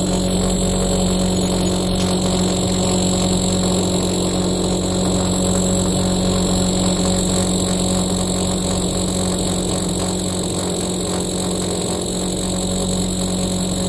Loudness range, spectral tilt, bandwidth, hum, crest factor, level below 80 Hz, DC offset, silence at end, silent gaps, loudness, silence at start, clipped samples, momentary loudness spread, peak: 3 LU; -4.5 dB/octave; 11.5 kHz; none; 14 dB; -30 dBFS; under 0.1%; 0 s; none; -18 LUFS; 0 s; under 0.1%; 3 LU; -4 dBFS